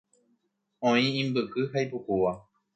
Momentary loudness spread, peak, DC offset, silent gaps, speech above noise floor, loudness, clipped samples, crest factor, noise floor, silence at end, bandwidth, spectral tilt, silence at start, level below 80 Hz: 6 LU; -12 dBFS; under 0.1%; none; 48 dB; -28 LUFS; under 0.1%; 18 dB; -75 dBFS; 0.35 s; 8.6 kHz; -6 dB/octave; 0.8 s; -64 dBFS